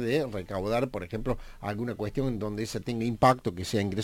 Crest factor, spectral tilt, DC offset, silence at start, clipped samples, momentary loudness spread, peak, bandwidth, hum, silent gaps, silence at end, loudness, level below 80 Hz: 20 dB; -6 dB/octave; under 0.1%; 0 s; under 0.1%; 10 LU; -8 dBFS; 16.5 kHz; none; none; 0 s; -30 LUFS; -46 dBFS